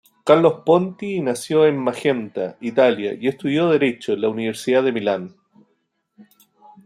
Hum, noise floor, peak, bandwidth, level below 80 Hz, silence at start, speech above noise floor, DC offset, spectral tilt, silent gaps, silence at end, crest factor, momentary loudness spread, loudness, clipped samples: none; -69 dBFS; -2 dBFS; 14 kHz; -68 dBFS; 0.25 s; 51 dB; under 0.1%; -6 dB/octave; none; 0.65 s; 18 dB; 9 LU; -19 LUFS; under 0.1%